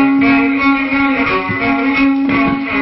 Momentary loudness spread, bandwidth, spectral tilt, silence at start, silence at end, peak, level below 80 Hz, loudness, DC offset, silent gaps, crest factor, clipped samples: 4 LU; 5.8 kHz; -10.5 dB/octave; 0 s; 0 s; 0 dBFS; -40 dBFS; -13 LUFS; under 0.1%; none; 12 dB; under 0.1%